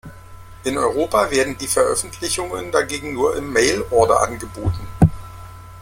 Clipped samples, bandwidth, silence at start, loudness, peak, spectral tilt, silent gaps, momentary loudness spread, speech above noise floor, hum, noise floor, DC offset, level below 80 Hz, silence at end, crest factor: under 0.1%; 16.5 kHz; 0.05 s; -19 LUFS; 0 dBFS; -4.5 dB/octave; none; 9 LU; 19 dB; none; -39 dBFS; under 0.1%; -38 dBFS; 0 s; 18 dB